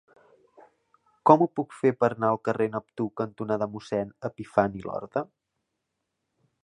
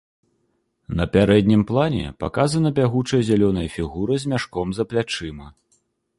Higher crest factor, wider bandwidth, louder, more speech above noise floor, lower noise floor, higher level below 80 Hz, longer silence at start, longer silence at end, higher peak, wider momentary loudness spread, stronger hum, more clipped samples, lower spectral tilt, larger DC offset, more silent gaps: first, 26 dB vs 18 dB; about the same, 10.5 kHz vs 11.5 kHz; second, -27 LUFS vs -21 LUFS; first, 55 dB vs 49 dB; first, -81 dBFS vs -69 dBFS; second, -64 dBFS vs -40 dBFS; first, 1.25 s vs 0.9 s; first, 1.4 s vs 0.7 s; about the same, -2 dBFS vs -2 dBFS; about the same, 13 LU vs 11 LU; neither; neither; first, -8 dB/octave vs -6.5 dB/octave; neither; neither